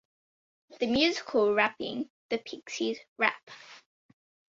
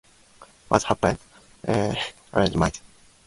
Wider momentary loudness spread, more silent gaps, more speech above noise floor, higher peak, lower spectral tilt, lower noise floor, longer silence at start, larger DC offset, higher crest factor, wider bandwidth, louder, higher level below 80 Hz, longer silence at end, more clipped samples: about the same, 13 LU vs 12 LU; first, 2.10-2.29 s, 3.08-3.16 s, 3.43-3.47 s vs none; first, over 60 dB vs 29 dB; second, -8 dBFS vs 0 dBFS; second, -3.5 dB/octave vs -5 dB/octave; first, under -90 dBFS vs -52 dBFS; first, 0.7 s vs 0.4 s; neither; about the same, 24 dB vs 26 dB; second, 7.8 kHz vs 11.5 kHz; second, -29 LUFS vs -25 LUFS; second, -66 dBFS vs -44 dBFS; first, 0.75 s vs 0.5 s; neither